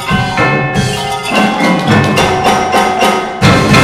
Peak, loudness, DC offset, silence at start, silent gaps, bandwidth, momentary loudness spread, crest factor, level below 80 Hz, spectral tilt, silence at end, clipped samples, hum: 0 dBFS; -10 LUFS; under 0.1%; 0 s; none; 16 kHz; 4 LU; 10 dB; -32 dBFS; -5 dB/octave; 0 s; 0.3%; none